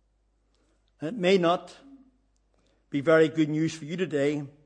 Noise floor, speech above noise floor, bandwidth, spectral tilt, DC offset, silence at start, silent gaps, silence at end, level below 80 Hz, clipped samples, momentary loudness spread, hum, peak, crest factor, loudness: -69 dBFS; 44 dB; 9.8 kHz; -6 dB/octave; under 0.1%; 1 s; none; 0.15 s; -70 dBFS; under 0.1%; 12 LU; none; -10 dBFS; 18 dB; -26 LUFS